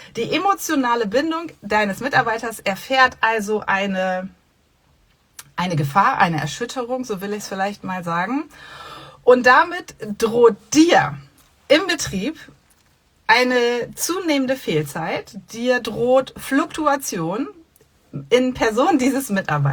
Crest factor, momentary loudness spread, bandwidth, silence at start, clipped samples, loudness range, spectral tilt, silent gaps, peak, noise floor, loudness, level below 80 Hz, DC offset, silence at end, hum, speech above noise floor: 18 dB; 13 LU; over 20 kHz; 0 s; under 0.1%; 5 LU; -4.5 dB/octave; none; -2 dBFS; -60 dBFS; -19 LUFS; -54 dBFS; under 0.1%; 0 s; none; 41 dB